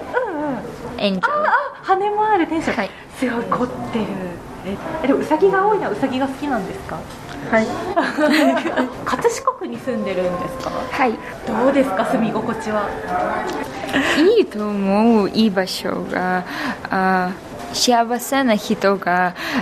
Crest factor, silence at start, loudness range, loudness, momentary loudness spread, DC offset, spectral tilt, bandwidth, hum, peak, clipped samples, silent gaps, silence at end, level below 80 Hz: 16 dB; 0 s; 3 LU; -19 LUFS; 11 LU; under 0.1%; -4.5 dB/octave; 13.5 kHz; none; -4 dBFS; under 0.1%; none; 0 s; -48 dBFS